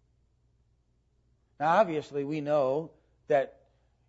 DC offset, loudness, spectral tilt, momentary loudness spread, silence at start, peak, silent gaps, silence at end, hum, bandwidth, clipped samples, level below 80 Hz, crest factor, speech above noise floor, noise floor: under 0.1%; -29 LUFS; -7 dB/octave; 9 LU; 1.6 s; -12 dBFS; none; 0.6 s; none; 8 kHz; under 0.1%; -70 dBFS; 20 dB; 43 dB; -70 dBFS